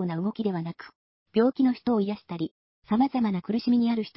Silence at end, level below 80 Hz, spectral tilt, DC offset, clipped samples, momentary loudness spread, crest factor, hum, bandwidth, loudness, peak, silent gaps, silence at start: 0.05 s; -66 dBFS; -11.5 dB/octave; under 0.1%; under 0.1%; 11 LU; 16 dB; none; 5.8 kHz; -27 LUFS; -12 dBFS; 0.95-1.26 s, 2.51-2.82 s; 0 s